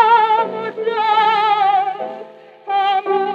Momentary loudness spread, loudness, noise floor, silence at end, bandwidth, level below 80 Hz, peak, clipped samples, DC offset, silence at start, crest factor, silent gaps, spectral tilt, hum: 14 LU; -16 LUFS; -37 dBFS; 0 s; 7 kHz; -86 dBFS; -2 dBFS; under 0.1%; under 0.1%; 0 s; 14 dB; none; -4.5 dB/octave; none